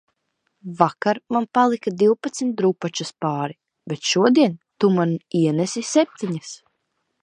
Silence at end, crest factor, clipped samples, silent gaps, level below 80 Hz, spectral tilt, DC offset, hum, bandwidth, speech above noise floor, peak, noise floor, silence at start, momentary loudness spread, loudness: 0.7 s; 20 dB; under 0.1%; none; -72 dBFS; -5 dB/octave; under 0.1%; none; 10.5 kHz; 53 dB; 0 dBFS; -74 dBFS; 0.65 s; 12 LU; -21 LUFS